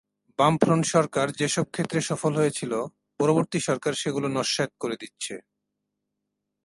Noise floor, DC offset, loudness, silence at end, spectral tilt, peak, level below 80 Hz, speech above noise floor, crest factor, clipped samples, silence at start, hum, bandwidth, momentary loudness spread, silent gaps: -82 dBFS; under 0.1%; -25 LUFS; 1.25 s; -4.5 dB/octave; -2 dBFS; -66 dBFS; 57 dB; 24 dB; under 0.1%; 0.4 s; none; 11.5 kHz; 12 LU; none